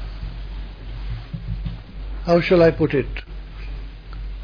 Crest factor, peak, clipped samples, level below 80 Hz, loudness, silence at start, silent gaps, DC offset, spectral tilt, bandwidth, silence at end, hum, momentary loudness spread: 18 dB; -4 dBFS; under 0.1%; -32 dBFS; -21 LUFS; 0 s; none; under 0.1%; -8.5 dB/octave; 5.4 kHz; 0 s; none; 21 LU